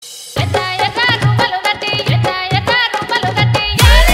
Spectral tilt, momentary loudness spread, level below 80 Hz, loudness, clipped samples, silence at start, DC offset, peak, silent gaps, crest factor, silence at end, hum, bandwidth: -4 dB/octave; 5 LU; -20 dBFS; -13 LUFS; under 0.1%; 0 s; under 0.1%; 0 dBFS; none; 12 dB; 0 s; none; 16.5 kHz